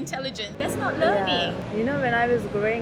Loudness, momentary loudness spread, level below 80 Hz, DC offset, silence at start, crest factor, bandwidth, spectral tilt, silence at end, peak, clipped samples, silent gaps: -24 LUFS; 8 LU; -50 dBFS; under 0.1%; 0 s; 16 dB; 19.5 kHz; -5 dB/octave; 0 s; -10 dBFS; under 0.1%; none